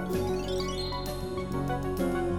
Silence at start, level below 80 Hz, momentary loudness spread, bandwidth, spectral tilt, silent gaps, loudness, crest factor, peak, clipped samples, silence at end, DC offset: 0 s; -42 dBFS; 4 LU; 18.5 kHz; -6 dB/octave; none; -32 LUFS; 12 dB; -18 dBFS; under 0.1%; 0 s; 0.4%